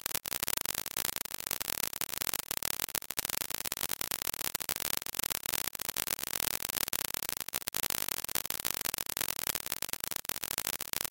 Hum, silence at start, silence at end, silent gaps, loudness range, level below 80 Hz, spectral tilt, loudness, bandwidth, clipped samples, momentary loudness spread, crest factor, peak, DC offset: none; 0.1 s; 0.05 s; none; 1 LU; -60 dBFS; 0 dB/octave; -33 LUFS; 17.5 kHz; under 0.1%; 3 LU; 32 dB; -4 dBFS; under 0.1%